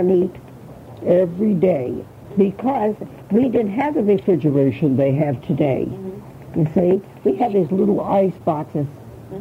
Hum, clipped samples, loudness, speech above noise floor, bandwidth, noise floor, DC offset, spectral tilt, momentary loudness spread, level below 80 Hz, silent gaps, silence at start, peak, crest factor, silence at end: none; under 0.1%; -19 LUFS; 20 dB; 15.5 kHz; -38 dBFS; under 0.1%; -10 dB/octave; 14 LU; -52 dBFS; none; 0 s; -4 dBFS; 14 dB; 0 s